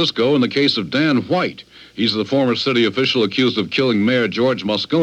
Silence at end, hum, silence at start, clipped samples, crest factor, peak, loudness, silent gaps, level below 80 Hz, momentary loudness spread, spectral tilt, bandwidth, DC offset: 0 s; none; 0 s; under 0.1%; 14 dB; -4 dBFS; -17 LUFS; none; -60 dBFS; 4 LU; -5.5 dB/octave; 9.4 kHz; under 0.1%